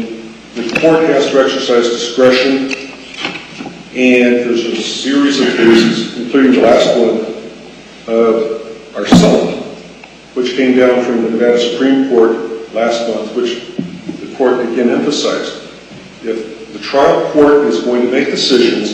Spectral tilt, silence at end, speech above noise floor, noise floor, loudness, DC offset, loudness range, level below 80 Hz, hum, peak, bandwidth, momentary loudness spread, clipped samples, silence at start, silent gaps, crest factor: -5 dB/octave; 0 s; 24 dB; -35 dBFS; -12 LUFS; under 0.1%; 5 LU; -46 dBFS; none; 0 dBFS; 9.8 kHz; 17 LU; under 0.1%; 0 s; none; 12 dB